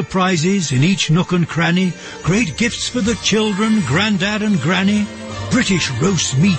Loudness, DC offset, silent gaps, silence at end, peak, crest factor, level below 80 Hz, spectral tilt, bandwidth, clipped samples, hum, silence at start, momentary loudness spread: -16 LUFS; under 0.1%; none; 0 s; -4 dBFS; 12 dB; -42 dBFS; -4.5 dB/octave; 8.8 kHz; under 0.1%; none; 0 s; 4 LU